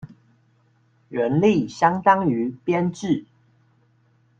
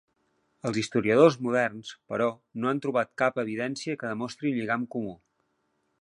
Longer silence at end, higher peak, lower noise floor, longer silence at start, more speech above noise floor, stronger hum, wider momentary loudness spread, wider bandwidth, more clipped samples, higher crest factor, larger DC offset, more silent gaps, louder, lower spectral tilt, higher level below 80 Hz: first, 1.15 s vs 0.85 s; about the same, -4 dBFS vs -6 dBFS; second, -61 dBFS vs -74 dBFS; second, 0.05 s vs 0.65 s; second, 41 dB vs 47 dB; neither; second, 8 LU vs 13 LU; second, 9 kHz vs 11 kHz; neither; about the same, 20 dB vs 22 dB; neither; neither; first, -21 LUFS vs -27 LUFS; first, -7 dB/octave vs -5.5 dB/octave; first, -60 dBFS vs -68 dBFS